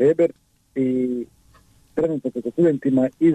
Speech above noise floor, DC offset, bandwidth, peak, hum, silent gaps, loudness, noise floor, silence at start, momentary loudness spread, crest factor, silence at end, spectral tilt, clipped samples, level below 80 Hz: 35 dB; under 0.1%; 9 kHz; -8 dBFS; none; none; -22 LUFS; -54 dBFS; 0 s; 12 LU; 12 dB; 0 s; -9 dB/octave; under 0.1%; -58 dBFS